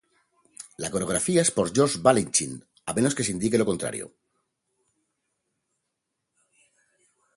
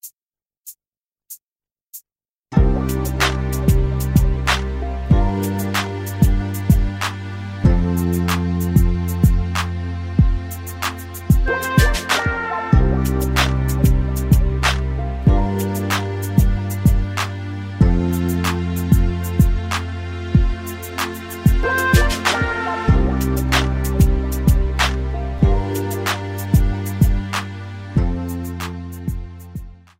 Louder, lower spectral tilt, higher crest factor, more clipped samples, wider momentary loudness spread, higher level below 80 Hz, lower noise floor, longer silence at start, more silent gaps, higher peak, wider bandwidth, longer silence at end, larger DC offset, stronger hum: second, -24 LUFS vs -19 LUFS; second, -4 dB/octave vs -5.5 dB/octave; first, 24 dB vs 16 dB; neither; first, 16 LU vs 11 LU; second, -58 dBFS vs -22 dBFS; second, -81 dBFS vs under -90 dBFS; first, 0.6 s vs 0.05 s; second, none vs 0.58-0.64 s, 1.06-1.10 s; about the same, -4 dBFS vs -2 dBFS; second, 12 kHz vs 16.5 kHz; first, 3.3 s vs 0.3 s; neither; neither